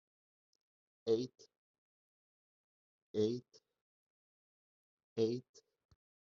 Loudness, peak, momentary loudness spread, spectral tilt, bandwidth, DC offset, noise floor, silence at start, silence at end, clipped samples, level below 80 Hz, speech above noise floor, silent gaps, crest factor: -39 LUFS; -22 dBFS; 10 LU; -7 dB/octave; 7.2 kHz; under 0.1%; under -90 dBFS; 1.05 s; 0.8 s; under 0.1%; -84 dBFS; over 53 dB; 1.57-3.14 s, 3.81-4.97 s, 5.04-5.16 s, 5.49-5.54 s; 22 dB